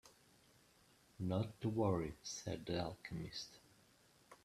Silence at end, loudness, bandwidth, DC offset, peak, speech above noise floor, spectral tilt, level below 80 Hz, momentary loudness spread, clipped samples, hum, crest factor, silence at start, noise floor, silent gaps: 0.1 s; -43 LUFS; 14 kHz; under 0.1%; -24 dBFS; 29 dB; -5.5 dB/octave; -68 dBFS; 13 LU; under 0.1%; none; 22 dB; 0.05 s; -71 dBFS; none